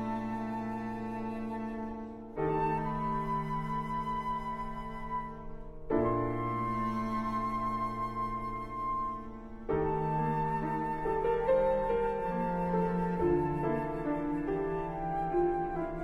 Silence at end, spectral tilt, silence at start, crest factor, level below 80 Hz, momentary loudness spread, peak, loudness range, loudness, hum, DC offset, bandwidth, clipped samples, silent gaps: 0 s; -9 dB/octave; 0 s; 16 dB; -46 dBFS; 9 LU; -16 dBFS; 4 LU; -33 LUFS; none; under 0.1%; 12.5 kHz; under 0.1%; none